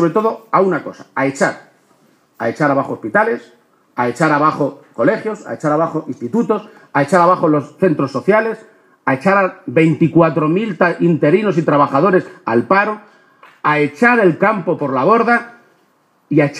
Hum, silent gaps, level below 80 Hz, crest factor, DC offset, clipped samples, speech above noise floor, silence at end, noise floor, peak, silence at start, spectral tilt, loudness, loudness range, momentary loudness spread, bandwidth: none; none; -64 dBFS; 16 dB; under 0.1%; under 0.1%; 43 dB; 0 s; -57 dBFS; 0 dBFS; 0 s; -7.5 dB/octave; -15 LUFS; 4 LU; 9 LU; 11.5 kHz